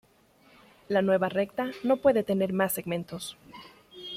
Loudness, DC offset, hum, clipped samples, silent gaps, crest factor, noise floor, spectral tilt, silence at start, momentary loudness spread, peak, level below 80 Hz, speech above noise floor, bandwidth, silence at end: -27 LUFS; under 0.1%; none; under 0.1%; none; 18 dB; -61 dBFS; -5.5 dB/octave; 0.9 s; 19 LU; -10 dBFS; -66 dBFS; 34 dB; 16 kHz; 0 s